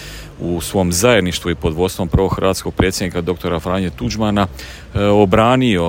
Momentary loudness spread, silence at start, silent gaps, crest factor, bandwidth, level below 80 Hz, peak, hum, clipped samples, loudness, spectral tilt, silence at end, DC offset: 10 LU; 0 s; none; 16 dB; 16.5 kHz; -32 dBFS; 0 dBFS; none; under 0.1%; -16 LUFS; -5 dB/octave; 0 s; under 0.1%